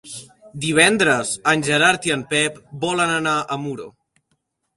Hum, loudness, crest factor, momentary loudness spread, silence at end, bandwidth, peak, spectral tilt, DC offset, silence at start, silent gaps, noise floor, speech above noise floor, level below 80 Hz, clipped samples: none; -18 LUFS; 20 dB; 17 LU; 0.85 s; 11.5 kHz; 0 dBFS; -3 dB/octave; under 0.1%; 0.05 s; none; -71 dBFS; 51 dB; -58 dBFS; under 0.1%